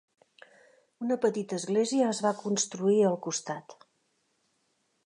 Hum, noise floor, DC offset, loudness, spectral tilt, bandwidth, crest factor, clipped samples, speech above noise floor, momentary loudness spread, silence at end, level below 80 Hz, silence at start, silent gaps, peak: none; -75 dBFS; under 0.1%; -29 LUFS; -4.5 dB/octave; 11 kHz; 18 dB; under 0.1%; 46 dB; 10 LU; 1.35 s; -84 dBFS; 1 s; none; -14 dBFS